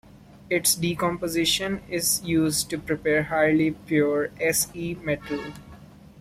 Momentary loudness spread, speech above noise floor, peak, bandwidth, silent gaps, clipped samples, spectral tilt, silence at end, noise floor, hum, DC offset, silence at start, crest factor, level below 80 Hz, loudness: 8 LU; 22 dB; -8 dBFS; 16 kHz; none; under 0.1%; -3.5 dB/octave; 0 s; -47 dBFS; none; under 0.1%; 0.15 s; 18 dB; -52 dBFS; -24 LUFS